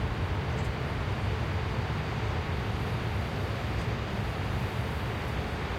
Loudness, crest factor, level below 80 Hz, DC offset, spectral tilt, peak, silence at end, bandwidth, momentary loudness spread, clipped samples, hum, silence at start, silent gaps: -32 LUFS; 12 dB; -38 dBFS; under 0.1%; -6.5 dB/octave; -18 dBFS; 0 s; 16 kHz; 1 LU; under 0.1%; none; 0 s; none